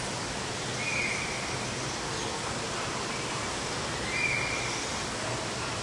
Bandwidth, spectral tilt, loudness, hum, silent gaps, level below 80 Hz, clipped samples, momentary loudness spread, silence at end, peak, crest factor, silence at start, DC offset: 11.5 kHz; -2.5 dB/octave; -31 LUFS; none; none; -52 dBFS; under 0.1%; 4 LU; 0 s; -18 dBFS; 14 dB; 0 s; under 0.1%